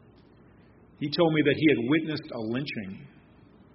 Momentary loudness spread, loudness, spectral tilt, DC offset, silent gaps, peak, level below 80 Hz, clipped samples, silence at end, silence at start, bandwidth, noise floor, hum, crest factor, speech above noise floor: 15 LU; -26 LUFS; -5 dB/octave; under 0.1%; none; -10 dBFS; -64 dBFS; under 0.1%; 0.65 s; 1 s; 5.8 kHz; -55 dBFS; none; 20 dB; 29 dB